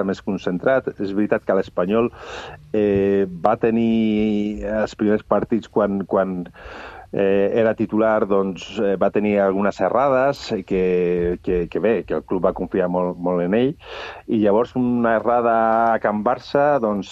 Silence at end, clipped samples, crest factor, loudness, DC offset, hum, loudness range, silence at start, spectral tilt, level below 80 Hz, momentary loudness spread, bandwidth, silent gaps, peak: 0 s; under 0.1%; 20 dB; -20 LUFS; under 0.1%; none; 2 LU; 0 s; -7.5 dB/octave; -46 dBFS; 7 LU; 7.8 kHz; none; 0 dBFS